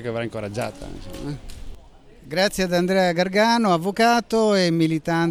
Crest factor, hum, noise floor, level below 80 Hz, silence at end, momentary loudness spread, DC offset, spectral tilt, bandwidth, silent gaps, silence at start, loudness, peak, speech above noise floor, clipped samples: 16 dB; none; -46 dBFS; -44 dBFS; 0 s; 15 LU; under 0.1%; -5 dB/octave; 16 kHz; none; 0 s; -20 LUFS; -4 dBFS; 25 dB; under 0.1%